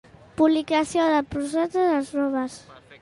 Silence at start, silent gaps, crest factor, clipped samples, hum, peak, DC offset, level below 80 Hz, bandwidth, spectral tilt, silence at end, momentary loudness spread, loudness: 0.4 s; none; 16 dB; under 0.1%; none; -8 dBFS; under 0.1%; -56 dBFS; 11.5 kHz; -4.5 dB/octave; 0.05 s; 10 LU; -23 LUFS